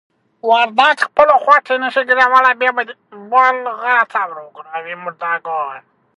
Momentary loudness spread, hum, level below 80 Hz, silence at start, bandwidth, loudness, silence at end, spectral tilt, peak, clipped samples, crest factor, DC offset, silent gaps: 16 LU; none; -62 dBFS; 0.45 s; 11 kHz; -14 LUFS; 0.4 s; -2.5 dB/octave; 0 dBFS; under 0.1%; 16 dB; under 0.1%; none